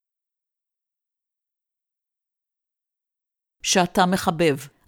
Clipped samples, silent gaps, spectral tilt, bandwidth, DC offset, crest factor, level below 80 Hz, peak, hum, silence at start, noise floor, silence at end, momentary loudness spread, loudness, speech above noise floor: under 0.1%; none; -4 dB/octave; 18 kHz; under 0.1%; 24 dB; -58 dBFS; -4 dBFS; none; 3.65 s; -87 dBFS; 0.2 s; 3 LU; -21 LUFS; 67 dB